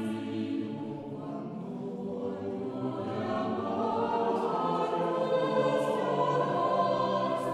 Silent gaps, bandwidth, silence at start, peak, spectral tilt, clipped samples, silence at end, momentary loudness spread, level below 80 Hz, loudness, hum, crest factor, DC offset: none; 12.5 kHz; 0 s; -16 dBFS; -7 dB/octave; under 0.1%; 0 s; 11 LU; -74 dBFS; -31 LUFS; none; 16 dB; under 0.1%